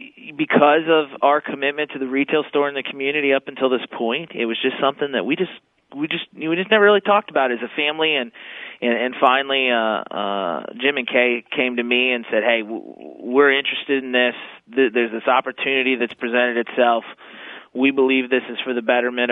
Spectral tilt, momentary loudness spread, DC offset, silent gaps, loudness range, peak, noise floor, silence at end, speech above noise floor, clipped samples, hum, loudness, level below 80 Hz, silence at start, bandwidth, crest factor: -7.5 dB/octave; 10 LU; under 0.1%; none; 2 LU; 0 dBFS; -39 dBFS; 0 s; 19 dB; under 0.1%; none; -19 LUFS; -74 dBFS; 0 s; 4 kHz; 20 dB